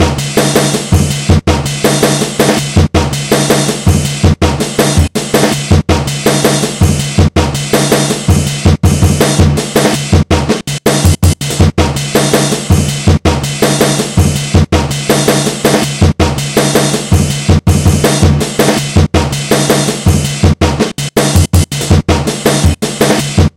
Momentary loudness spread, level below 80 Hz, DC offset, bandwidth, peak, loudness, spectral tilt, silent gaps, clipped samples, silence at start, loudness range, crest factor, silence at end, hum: 3 LU; -22 dBFS; under 0.1%; 16.5 kHz; 0 dBFS; -10 LUFS; -5 dB/octave; none; 1%; 0 s; 1 LU; 10 dB; 0.1 s; none